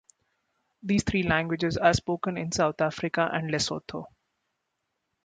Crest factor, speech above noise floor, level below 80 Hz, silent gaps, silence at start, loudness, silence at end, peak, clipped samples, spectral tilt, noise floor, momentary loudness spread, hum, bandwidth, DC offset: 22 dB; 54 dB; -50 dBFS; none; 0.85 s; -27 LUFS; 1.2 s; -8 dBFS; under 0.1%; -5 dB/octave; -81 dBFS; 10 LU; none; 9.6 kHz; under 0.1%